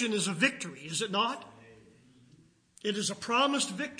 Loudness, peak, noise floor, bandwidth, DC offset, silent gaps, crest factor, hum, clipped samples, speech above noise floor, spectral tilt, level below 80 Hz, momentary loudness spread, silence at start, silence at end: -30 LUFS; -10 dBFS; -62 dBFS; 10.5 kHz; under 0.1%; none; 22 dB; none; under 0.1%; 31 dB; -2.5 dB/octave; -78 dBFS; 12 LU; 0 s; 0 s